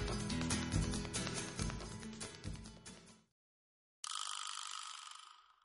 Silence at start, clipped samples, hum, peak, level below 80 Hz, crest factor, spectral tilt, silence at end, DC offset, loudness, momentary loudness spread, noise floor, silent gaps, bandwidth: 0 s; under 0.1%; none; -22 dBFS; -52 dBFS; 22 dB; -3.5 dB/octave; 0.1 s; under 0.1%; -42 LUFS; 16 LU; under -90 dBFS; 3.32-4.03 s; 11.5 kHz